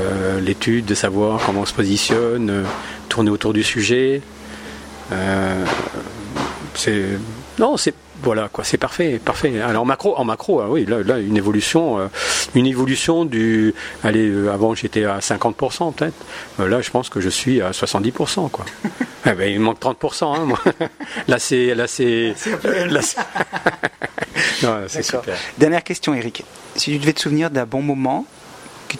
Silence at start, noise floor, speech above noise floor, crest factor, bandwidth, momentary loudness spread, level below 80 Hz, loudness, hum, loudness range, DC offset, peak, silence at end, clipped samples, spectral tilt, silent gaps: 0 s; -39 dBFS; 20 dB; 18 dB; 16 kHz; 9 LU; -48 dBFS; -19 LUFS; none; 3 LU; under 0.1%; 0 dBFS; 0 s; under 0.1%; -4.5 dB/octave; none